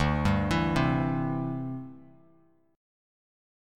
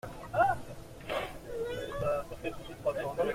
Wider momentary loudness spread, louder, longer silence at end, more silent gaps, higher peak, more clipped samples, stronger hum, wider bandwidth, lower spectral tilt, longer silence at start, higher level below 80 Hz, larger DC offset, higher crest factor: about the same, 12 LU vs 11 LU; first, -28 LUFS vs -34 LUFS; first, 1.7 s vs 0 s; neither; first, -12 dBFS vs -16 dBFS; neither; neither; second, 13.5 kHz vs 16.5 kHz; first, -7 dB/octave vs -5.5 dB/octave; about the same, 0 s vs 0.05 s; first, -42 dBFS vs -52 dBFS; neither; about the same, 18 dB vs 20 dB